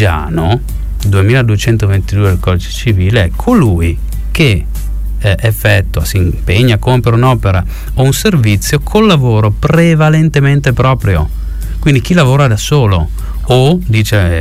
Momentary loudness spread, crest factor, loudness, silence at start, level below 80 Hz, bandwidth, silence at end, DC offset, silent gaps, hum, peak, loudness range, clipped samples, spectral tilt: 7 LU; 10 dB; -11 LUFS; 0 s; -20 dBFS; 16 kHz; 0 s; under 0.1%; none; none; 0 dBFS; 3 LU; under 0.1%; -6 dB/octave